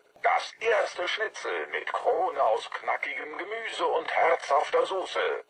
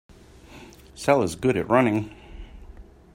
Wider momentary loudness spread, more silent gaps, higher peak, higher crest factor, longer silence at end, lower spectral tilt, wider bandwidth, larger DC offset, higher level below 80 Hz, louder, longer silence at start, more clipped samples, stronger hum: second, 8 LU vs 25 LU; neither; second, -12 dBFS vs -4 dBFS; second, 16 dB vs 22 dB; second, 0.05 s vs 0.3 s; second, -1.5 dB/octave vs -6 dB/octave; second, 10.5 kHz vs 16 kHz; neither; second, -78 dBFS vs -48 dBFS; second, -28 LUFS vs -22 LUFS; second, 0.25 s vs 0.55 s; neither; neither